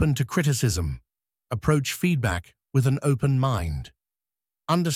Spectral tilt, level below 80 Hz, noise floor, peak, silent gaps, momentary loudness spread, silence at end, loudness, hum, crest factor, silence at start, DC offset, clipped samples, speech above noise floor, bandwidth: -6 dB/octave; -42 dBFS; under -90 dBFS; -8 dBFS; none; 12 LU; 0 s; -25 LUFS; none; 18 dB; 0 s; under 0.1%; under 0.1%; over 67 dB; 16 kHz